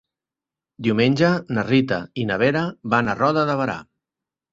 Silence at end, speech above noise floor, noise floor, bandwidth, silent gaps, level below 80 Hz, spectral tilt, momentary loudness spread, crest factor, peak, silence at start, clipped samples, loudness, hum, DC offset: 0.7 s; 69 dB; -89 dBFS; 7.8 kHz; none; -56 dBFS; -7 dB/octave; 7 LU; 18 dB; -4 dBFS; 0.8 s; under 0.1%; -21 LUFS; none; under 0.1%